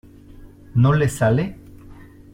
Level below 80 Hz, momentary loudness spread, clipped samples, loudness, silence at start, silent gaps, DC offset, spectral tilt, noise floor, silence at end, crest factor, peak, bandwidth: -44 dBFS; 8 LU; under 0.1%; -19 LUFS; 0.4 s; none; under 0.1%; -7.5 dB/octave; -43 dBFS; 0.4 s; 16 dB; -6 dBFS; 15.5 kHz